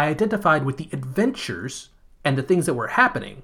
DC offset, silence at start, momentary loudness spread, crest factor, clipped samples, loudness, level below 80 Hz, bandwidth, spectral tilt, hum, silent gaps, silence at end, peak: under 0.1%; 0 s; 12 LU; 20 dB; under 0.1%; -22 LUFS; -52 dBFS; 18.5 kHz; -5.5 dB/octave; none; none; 0 s; -2 dBFS